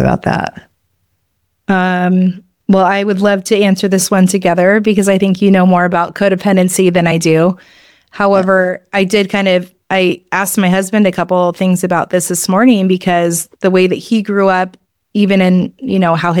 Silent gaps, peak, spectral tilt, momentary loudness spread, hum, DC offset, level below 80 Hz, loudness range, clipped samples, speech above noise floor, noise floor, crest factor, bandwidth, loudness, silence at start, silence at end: none; 0 dBFS; -5.5 dB/octave; 6 LU; none; 0.2%; -46 dBFS; 3 LU; under 0.1%; 54 dB; -65 dBFS; 12 dB; 17 kHz; -12 LUFS; 0 s; 0 s